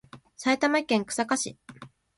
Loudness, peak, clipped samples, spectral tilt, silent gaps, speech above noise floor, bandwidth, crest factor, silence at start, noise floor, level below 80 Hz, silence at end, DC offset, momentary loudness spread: -26 LUFS; -8 dBFS; under 0.1%; -3 dB/octave; none; 23 dB; 11.5 kHz; 20 dB; 0.15 s; -49 dBFS; -68 dBFS; 0.3 s; under 0.1%; 10 LU